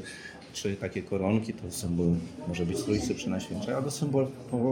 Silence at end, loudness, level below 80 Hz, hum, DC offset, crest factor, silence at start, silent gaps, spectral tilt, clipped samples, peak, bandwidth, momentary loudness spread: 0 s; -31 LUFS; -52 dBFS; none; under 0.1%; 16 dB; 0 s; none; -6 dB/octave; under 0.1%; -14 dBFS; 17 kHz; 7 LU